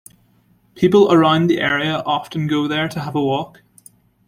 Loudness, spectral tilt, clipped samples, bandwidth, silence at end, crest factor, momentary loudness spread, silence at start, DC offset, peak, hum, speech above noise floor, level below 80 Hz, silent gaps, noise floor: -17 LUFS; -6.5 dB/octave; under 0.1%; 15.5 kHz; 0.8 s; 16 dB; 9 LU; 0.75 s; under 0.1%; -2 dBFS; none; 40 dB; -54 dBFS; none; -57 dBFS